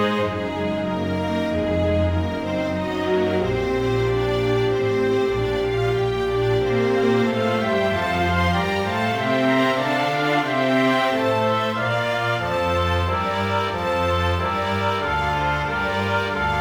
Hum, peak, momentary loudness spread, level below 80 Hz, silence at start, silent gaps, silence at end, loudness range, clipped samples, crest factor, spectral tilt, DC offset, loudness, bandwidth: none; -8 dBFS; 4 LU; -40 dBFS; 0 s; none; 0 s; 2 LU; under 0.1%; 14 dB; -6.5 dB/octave; under 0.1%; -21 LUFS; over 20 kHz